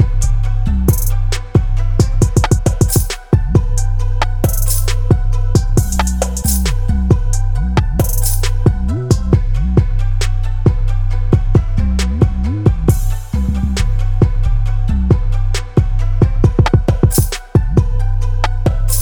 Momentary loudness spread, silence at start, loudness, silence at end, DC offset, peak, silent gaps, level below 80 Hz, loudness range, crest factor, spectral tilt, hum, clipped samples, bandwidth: 5 LU; 0 s; -16 LUFS; 0 s; 2%; 0 dBFS; none; -16 dBFS; 1 LU; 12 dB; -6 dB/octave; none; under 0.1%; over 20 kHz